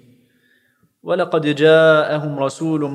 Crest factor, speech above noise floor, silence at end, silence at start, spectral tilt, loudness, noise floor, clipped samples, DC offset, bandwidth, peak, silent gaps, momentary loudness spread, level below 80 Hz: 16 dB; 45 dB; 0 s; 1.05 s; -6 dB/octave; -16 LUFS; -60 dBFS; under 0.1%; under 0.1%; 11 kHz; 0 dBFS; none; 11 LU; -70 dBFS